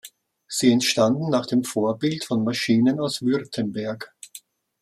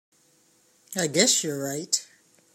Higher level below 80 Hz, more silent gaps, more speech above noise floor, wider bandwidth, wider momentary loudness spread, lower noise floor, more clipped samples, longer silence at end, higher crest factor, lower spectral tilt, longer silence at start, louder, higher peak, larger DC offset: first, -66 dBFS vs -74 dBFS; neither; second, 26 dB vs 38 dB; second, 14.5 kHz vs 16.5 kHz; about the same, 13 LU vs 11 LU; second, -48 dBFS vs -63 dBFS; neither; about the same, 0.45 s vs 0.5 s; second, 18 dB vs 24 dB; first, -4.5 dB/octave vs -2 dB/octave; second, 0.05 s vs 0.9 s; about the same, -22 LUFS vs -24 LUFS; about the same, -6 dBFS vs -6 dBFS; neither